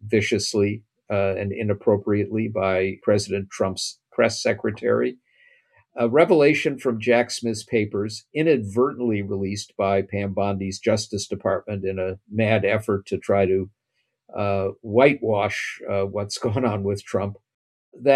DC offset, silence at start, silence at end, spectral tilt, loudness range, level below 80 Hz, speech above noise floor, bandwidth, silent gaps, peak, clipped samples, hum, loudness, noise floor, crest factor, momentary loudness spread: under 0.1%; 0 s; 0 s; -5.5 dB/octave; 3 LU; -66 dBFS; 53 dB; 12.5 kHz; 17.54-17.92 s; -2 dBFS; under 0.1%; none; -23 LUFS; -75 dBFS; 20 dB; 9 LU